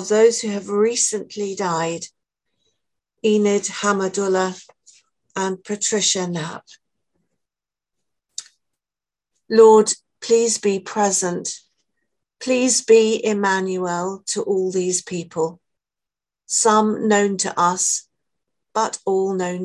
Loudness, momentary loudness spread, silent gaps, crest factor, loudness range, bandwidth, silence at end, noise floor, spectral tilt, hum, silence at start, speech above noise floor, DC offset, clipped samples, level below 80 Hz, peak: -19 LUFS; 13 LU; none; 20 dB; 7 LU; 12 kHz; 0 s; under -90 dBFS; -3.5 dB/octave; none; 0 s; over 71 dB; under 0.1%; under 0.1%; -68 dBFS; -2 dBFS